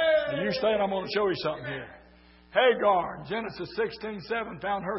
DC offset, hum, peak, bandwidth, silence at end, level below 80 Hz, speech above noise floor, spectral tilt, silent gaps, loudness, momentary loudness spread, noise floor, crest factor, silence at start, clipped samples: under 0.1%; none; -10 dBFS; 5.8 kHz; 0 s; -58 dBFS; 27 dB; -8.5 dB/octave; none; -28 LUFS; 12 LU; -55 dBFS; 18 dB; 0 s; under 0.1%